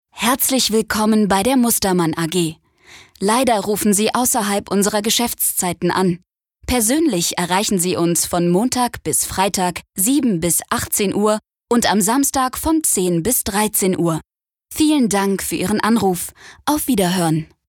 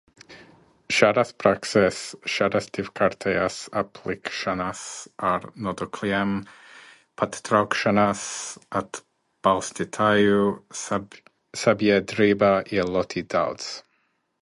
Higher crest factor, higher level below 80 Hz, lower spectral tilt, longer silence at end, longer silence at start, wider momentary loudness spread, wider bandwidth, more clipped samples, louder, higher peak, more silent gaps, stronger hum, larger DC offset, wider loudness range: second, 16 dB vs 24 dB; first, -44 dBFS vs -56 dBFS; about the same, -3.5 dB/octave vs -4.5 dB/octave; second, 0.25 s vs 0.6 s; second, 0.15 s vs 0.3 s; second, 6 LU vs 12 LU; first, 19.5 kHz vs 11.5 kHz; neither; first, -17 LUFS vs -24 LUFS; about the same, -2 dBFS vs -2 dBFS; neither; neither; neither; second, 1 LU vs 5 LU